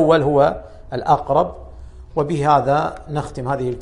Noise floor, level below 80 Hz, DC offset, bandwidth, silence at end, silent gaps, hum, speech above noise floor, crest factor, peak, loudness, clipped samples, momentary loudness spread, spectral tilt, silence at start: -37 dBFS; -40 dBFS; under 0.1%; 11 kHz; 0 s; none; none; 19 dB; 16 dB; -2 dBFS; -19 LUFS; under 0.1%; 12 LU; -7.5 dB/octave; 0 s